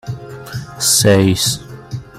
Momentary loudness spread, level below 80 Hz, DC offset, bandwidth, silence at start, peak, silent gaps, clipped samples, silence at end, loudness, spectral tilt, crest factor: 20 LU; -44 dBFS; under 0.1%; 16 kHz; 0.05 s; 0 dBFS; none; under 0.1%; 0 s; -13 LUFS; -3.5 dB/octave; 16 dB